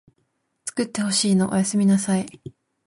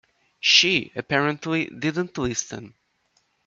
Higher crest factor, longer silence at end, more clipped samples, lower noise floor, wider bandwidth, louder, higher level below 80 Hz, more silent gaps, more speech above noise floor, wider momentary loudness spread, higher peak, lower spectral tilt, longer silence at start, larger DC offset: second, 16 dB vs 22 dB; second, 0.35 s vs 0.8 s; neither; about the same, -71 dBFS vs -68 dBFS; first, 11.5 kHz vs 7.8 kHz; about the same, -21 LUFS vs -21 LUFS; about the same, -60 dBFS vs -56 dBFS; neither; first, 50 dB vs 45 dB; about the same, 12 LU vs 12 LU; second, -6 dBFS vs -2 dBFS; first, -4.5 dB/octave vs -2.5 dB/octave; first, 0.65 s vs 0.45 s; neither